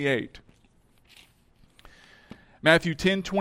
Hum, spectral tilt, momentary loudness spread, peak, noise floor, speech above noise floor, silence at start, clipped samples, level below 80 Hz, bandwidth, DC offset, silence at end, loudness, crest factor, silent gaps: none; -5 dB/octave; 9 LU; -6 dBFS; -61 dBFS; 37 dB; 0 s; under 0.1%; -54 dBFS; 16 kHz; under 0.1%; 0 s; -24 LUFS; 24 dB; none